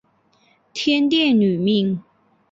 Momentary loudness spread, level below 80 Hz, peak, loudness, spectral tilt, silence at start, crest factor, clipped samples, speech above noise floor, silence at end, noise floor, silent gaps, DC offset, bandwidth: 11 LU; -64 dBFS; -6 dBFS; -18 LUFS; -6 dB/octave; 0.75 s; 14 dB; under 0.1%; 42 dB; 0.5 s; -60 dBFS; none; under 0.1%; 7.8 kHz